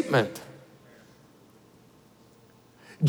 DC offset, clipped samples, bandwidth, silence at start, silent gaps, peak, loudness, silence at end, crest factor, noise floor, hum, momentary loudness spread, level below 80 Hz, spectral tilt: under 0.1%; under 0.1%; over 20 kHz; 0 s; none; -12 dBFS; -29 LUFS; 0 s; 20 dB; -57 dBFS; none; 31 LU; -74 dBFS; -6.5 dB/octave